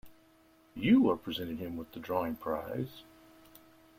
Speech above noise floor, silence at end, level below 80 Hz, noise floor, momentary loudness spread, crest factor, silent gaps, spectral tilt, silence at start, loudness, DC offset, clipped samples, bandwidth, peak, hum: 32 dB; 0.95 s; -64 dBFS; -63 dBFS; 17 LU; 20 dB; none; -7.5 dB/octave; 0.05 s; -32 LUFS; under 0.1%; under 0.1%; 16 kHz; -14 dBFS; none